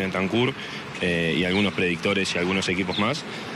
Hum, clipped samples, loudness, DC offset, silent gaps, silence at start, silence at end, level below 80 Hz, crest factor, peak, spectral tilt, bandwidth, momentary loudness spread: none; under 0.1%; -24 LUFS; under 0.1%; none; 0 s; 0 s; -54 dBFS; 14 dB; -10 dBFS; -5 dB/octave; 13 kHz; 5 LU